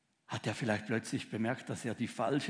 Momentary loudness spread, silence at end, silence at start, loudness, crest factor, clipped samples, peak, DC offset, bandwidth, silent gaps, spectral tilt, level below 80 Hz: 6 LU; 0 s; 0.3 s; -37 LUFS; 18 dB; under 0.1%; -18 dBFS; under 0.1%; 10.5 kHz; none; -5.5 dB/octave; -76 dBFS